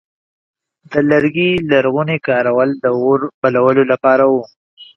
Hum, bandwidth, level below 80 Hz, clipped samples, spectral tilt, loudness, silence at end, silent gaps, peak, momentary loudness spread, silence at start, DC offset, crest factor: none; 6.2 kHz; -54 dBFS; under 0.1%; -8 dB/octave; -14 LUFS; 0.1 s; 3.34-3.42 s, 4.56-4.77 s; 0 dBFS; 4 LU; 0.9 s; under 0.1%; 14 dB